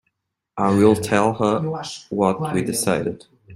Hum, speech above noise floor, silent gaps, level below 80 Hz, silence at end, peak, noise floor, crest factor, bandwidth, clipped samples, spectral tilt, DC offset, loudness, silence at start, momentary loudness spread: none; 55 dB; none; -54 dBFS; 0 s; -2 dBFS; -75 dBFS; 18 dB; 15.5 kHz; under 0.1%; -5.5 dB/octave; under 0.1%; -20 LUFS; 0.55 s; 13 LU